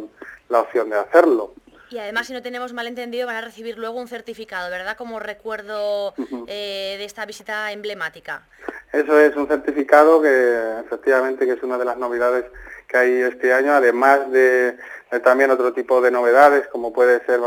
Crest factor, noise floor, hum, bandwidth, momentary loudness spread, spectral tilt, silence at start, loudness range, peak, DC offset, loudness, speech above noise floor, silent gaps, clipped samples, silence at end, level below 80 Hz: 18 dB; -38 dBFS; none; 19 kHz; 16 LU; -3.5 dB/octave; 0 s; 12 LU; 0 dBFS; under 0.1%; -18 LUFS; 20 dB; none; under 0.1%; 0 s; -60 dBFS